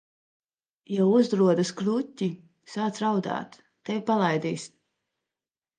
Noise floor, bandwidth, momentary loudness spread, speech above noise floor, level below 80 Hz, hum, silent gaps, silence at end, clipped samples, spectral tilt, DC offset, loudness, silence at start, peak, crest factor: under -90 dBFS; 9.6 kHz; 17 LU; over 65 dB; -76 dBFS; none; none; 1.1 s; under 0.1%; -6.5 dB/octave; under 0.1%; -26 LUFS; 0.9 s; -8 dBFS; 18 dB